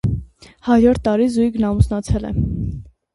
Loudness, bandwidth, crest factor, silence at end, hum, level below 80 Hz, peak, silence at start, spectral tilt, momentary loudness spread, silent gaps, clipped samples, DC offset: -18 LUFS; 11.5 kHz; 18 dB; 0.25 s; none; -28 dBFS; 0 dBFS; 0.05 s; -8 dB/octave; 14 LU; none; under 0.1%; under 0.1%